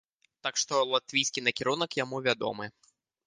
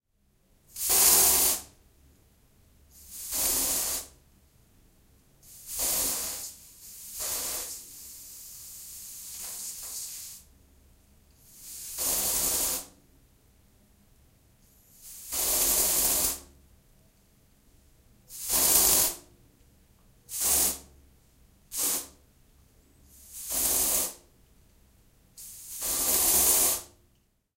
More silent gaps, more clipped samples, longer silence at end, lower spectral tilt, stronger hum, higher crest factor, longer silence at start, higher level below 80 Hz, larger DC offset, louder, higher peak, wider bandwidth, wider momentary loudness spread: neither; neither; second, 0.55 s vs 0.7 s; first, -2 dB/octave vs 0 dB/octave; neither; about the same, 22 dB vs 26 dB; second, 0.45 s vs 0.75 s; second, -74 dBFS vs -54 dBFS; neither; second, -29 LUFS vs -25 LUFS; about the same, -8 dBFS vs -6 dBFS; second, 10.5 kHz vs 16 kHz; second, 9 LU vs 24 LU